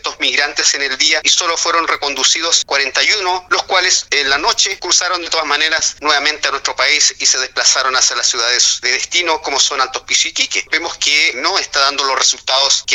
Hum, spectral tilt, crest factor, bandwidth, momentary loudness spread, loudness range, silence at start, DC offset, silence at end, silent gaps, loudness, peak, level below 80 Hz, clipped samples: none; 2 dB/octave; 14 dB; 17 kHz; 4 LU; 1 LU; 0.05 s; under 0.1%; 0 s; none; -12 LUFS; 0 dBFS; -50 dBFS; under 0.1%